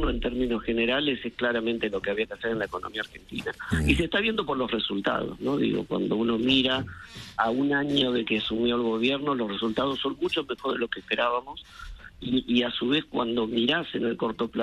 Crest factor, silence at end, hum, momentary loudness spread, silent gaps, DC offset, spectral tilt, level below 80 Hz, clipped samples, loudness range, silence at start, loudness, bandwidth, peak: 18 dB; 0 s; none; 10 LU; none; under 0.1%; -5.5 dB/octave; -44 dBFS; under 0.1%; 3 LU; 0 s; -27 LUFS; 12.5 kHz; -8 dBFS